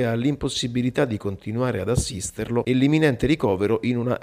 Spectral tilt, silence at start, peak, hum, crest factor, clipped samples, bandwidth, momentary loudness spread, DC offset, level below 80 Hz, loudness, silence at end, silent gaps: -5.5 dB/octave; 0 s; -6 dBFS; none; 16 dB; under 0.1%; 15.5 kHz; 7 LU; under 0.1%; -42 dBFS; -23 LUFS; 0 s; none